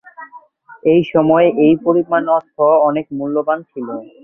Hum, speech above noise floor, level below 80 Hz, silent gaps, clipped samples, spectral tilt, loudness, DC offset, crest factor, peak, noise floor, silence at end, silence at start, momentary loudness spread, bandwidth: none; 27 dB; -56 dBFS; none; under 0.1%; -10 dB/octave; -14 LUFS; under 0.1%; 14 dB; -2 dBFS; -41 dBFS; 0.2 s; 0.2 s; 10 LU; 3.4 kHz